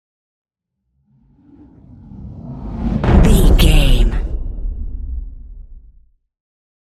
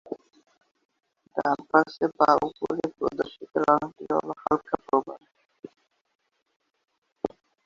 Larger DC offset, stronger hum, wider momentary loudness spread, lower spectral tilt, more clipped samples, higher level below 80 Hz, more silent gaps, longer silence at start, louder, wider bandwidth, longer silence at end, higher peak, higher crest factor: neither; neither; first, 23 LU vs 14 LU; about the same, -6 dB/octave vs -6.5 dB/octave; neither; first, -18 dBFS vs -64 dBFS; second, none vs 0.85-0.89 s, 5.59-5.63 s, 6.01-6.05 s, 6.15-6.19 s, 6.56-6.60 s, 6.98-7.02 s; first, 2.1 s vs 0.1 s; first, -16 LUFS vs -26 LUFS; first, 14 kHz vs 7.6 kHz; first, 1.15 s vs 0.4 s; first, 0 dBFS vs -4 dBFS; second, 16 dB vs 24 dB